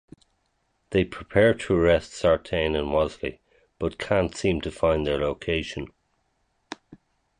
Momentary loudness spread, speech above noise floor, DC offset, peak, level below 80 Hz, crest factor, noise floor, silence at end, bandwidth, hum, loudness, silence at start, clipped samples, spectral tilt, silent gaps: 15 LU; 48 dB; under 0.1%; -6 dBFS; -42 dBFS; 20 dB; -72 dBFS; 0.45 s; 10.5 kHz; none; -25 LUFS; 0.9 s; under 0.1%; -6 dB/octave; none